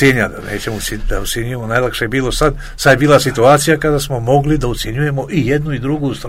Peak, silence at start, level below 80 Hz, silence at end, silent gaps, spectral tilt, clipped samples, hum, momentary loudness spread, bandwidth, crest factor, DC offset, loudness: 0 dBFS; 0 s; -28 dBFS; 0 s; none; -5 dB/octave; 0.1%; none; 10 LU; 16.5 kHz; 14 dB; under 0.1%; -15 LUFS